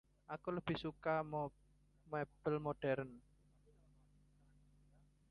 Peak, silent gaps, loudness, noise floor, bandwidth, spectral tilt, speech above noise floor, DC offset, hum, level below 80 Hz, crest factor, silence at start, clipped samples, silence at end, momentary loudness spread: -26 dBFS; none; -43 LUFS; -71 dBFS; 10.5 kHz; -8.5 dB/octave; 28 dB; under 0.1%; 50 Hz at -65 dBFS; -70 dBFS; 20 dB; 0.3 s; under 0.1%; 2.1 s; 8 LU